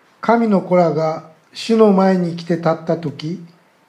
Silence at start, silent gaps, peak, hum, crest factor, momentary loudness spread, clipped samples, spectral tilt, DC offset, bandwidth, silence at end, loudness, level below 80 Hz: 0.25 s; none; 0 dBFS; none; 16 dB; 16 LU; under 0.1%; -7.5 dB/octave; under 0.1%; 10.5 kHz; 0.4 s; -16 LUFS; -68 dBFS